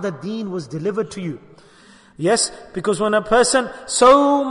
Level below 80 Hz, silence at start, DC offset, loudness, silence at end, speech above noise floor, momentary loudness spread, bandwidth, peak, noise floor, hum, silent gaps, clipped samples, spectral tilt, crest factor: -50 dBFS; 0 s; under 0.1%; -18 LUFS; 0 s; 30 dB; 15 LU; 11 kHz; -2 dBFS; -48 dBFS; none; none; under 0.1%; -3.5 dB/octave; 16 dB